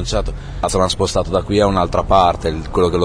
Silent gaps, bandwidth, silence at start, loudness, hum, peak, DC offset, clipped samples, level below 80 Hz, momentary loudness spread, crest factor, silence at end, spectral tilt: none; 11 kHz; 0 s; -17 LUFS; none; -2 dBFS; under 0.1%; under 0.1%; -28 dBFS; 8 LU; 14 dB; 0 s; -5.5 dB/octave